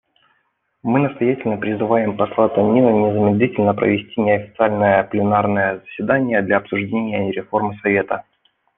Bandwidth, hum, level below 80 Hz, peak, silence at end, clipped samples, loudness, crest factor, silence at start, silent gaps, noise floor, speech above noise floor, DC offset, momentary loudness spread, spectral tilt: 3.9 kHz; none; -58 dBFS; -2 dBFS; 0.55 s; under 0.1%; -18 LUFS; 16 dB; 0.85 s; none; -67 dBFS; 50 dB; under 0.1%; 7 LU; -10.5 dB/octave